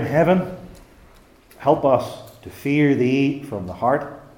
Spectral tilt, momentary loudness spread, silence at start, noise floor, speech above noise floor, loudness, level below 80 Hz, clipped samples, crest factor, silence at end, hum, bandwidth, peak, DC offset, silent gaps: -7.5 dB/octave; 16 LU; 0 s; -50 dBFS; 30 dB; -20 LUFS; -52 dBFS; under 0.1%; 18 dB; 0.2 s; none; 17 kHz; -2 dBFS; under 0.1%; none